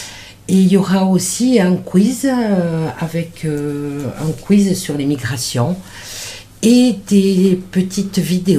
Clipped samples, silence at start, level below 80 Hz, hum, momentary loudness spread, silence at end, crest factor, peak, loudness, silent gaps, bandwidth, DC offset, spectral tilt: under 0.1%; 0 s; -46 dBFS; none; 11 LU; 0 s; 14 dB; 0 dBFS; -15 LUFS; none; 15.5 kHz; under 0.1%; -6 dB/octave